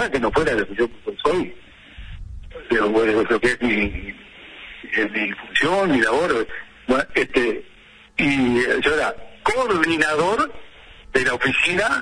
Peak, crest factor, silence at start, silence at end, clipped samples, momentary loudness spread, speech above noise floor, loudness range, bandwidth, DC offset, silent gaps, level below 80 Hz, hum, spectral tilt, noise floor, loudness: -2 dBFS; 18 dB; 0 s; 0 s; under 0.1%; 18 LU; 28 dB; 2 LU; 10.5 kHz; under 0.1%; none; -42 dBFS; none; -4.5 dB/octave; -48 dBFS; -20 LUFS